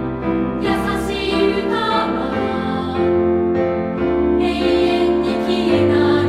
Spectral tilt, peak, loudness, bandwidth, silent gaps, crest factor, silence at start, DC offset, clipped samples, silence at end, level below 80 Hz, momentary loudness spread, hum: -6.5 dB/octave; -4 dBFS; -18 LUFS; 12 kHz; none; 12 dB; 0 s; under 0.1%; under 0.1%; 0 s; -36 dBFS; 5 LU; none